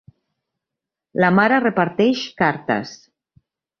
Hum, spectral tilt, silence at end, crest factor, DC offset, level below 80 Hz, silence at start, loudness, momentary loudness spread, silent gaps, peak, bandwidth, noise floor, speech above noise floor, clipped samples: none; -6.5 dB/octave; 0.85 s; 20 dB; under 0.1%; -62 dBFS; 1.15 s; -18 LUFS; 9 LU; none; -2 dBFS; 6.8 kHz; -85 dBFS; 67 dB; under 0.1%